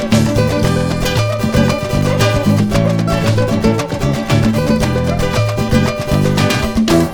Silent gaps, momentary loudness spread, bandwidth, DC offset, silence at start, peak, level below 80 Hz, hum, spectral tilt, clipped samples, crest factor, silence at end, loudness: none; 3 LU; over 20 kHz; under 0.1%; 0 s; 0 dBFS; -28 dBFS; none; -6 dB/octave; under 0.1%; 12 dB; 0 s; -14 LUFS